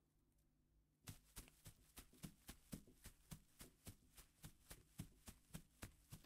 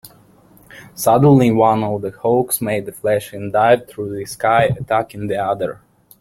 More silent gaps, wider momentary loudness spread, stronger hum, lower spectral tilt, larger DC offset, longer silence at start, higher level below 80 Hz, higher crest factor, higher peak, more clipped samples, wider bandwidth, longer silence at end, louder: neither; second, 6 LU vs 12 LU; neither; second, -4 dB/octave vs -6 dB/octave; neither; about the same, 0 s vs 0.05 s; second, -70 dBFS vs -50 dBFS; first, 24 dB vs 16 dB; second, -38 dBFS vs -2 dBFS; neither; about the same, 16 kHz vs 16.5 kHz; second, 0 s vs 0.45 s; second, -62 LUFS vs -17 LUFS